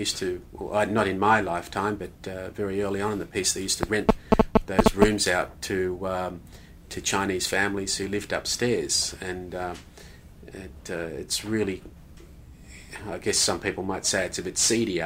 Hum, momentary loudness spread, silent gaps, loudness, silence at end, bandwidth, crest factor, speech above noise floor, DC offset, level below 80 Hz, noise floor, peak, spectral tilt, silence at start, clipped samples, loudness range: none; 14 LU; none; -26 LUFS; 0 s; 16 kHz; 26 dB; 21 dB; under 0.1%; -42 dBFS; -47 dBFS; -2 dBFS; -3 dB/octave; 0 s; under 0.1%; 9 LU